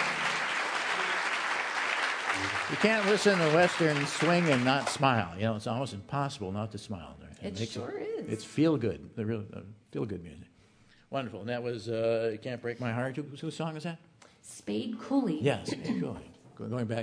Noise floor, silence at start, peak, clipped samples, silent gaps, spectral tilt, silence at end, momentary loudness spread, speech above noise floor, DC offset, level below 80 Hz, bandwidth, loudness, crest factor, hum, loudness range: -61 dBFS; 0 s; -8 dBFS; under 0.1%; none; -5 dB/octave; 0 s; 16 LU; 31 dB; under 0.1%; -66 dBFS; 11 kHz; -30 LUFS; 22 dB; none; 9 LU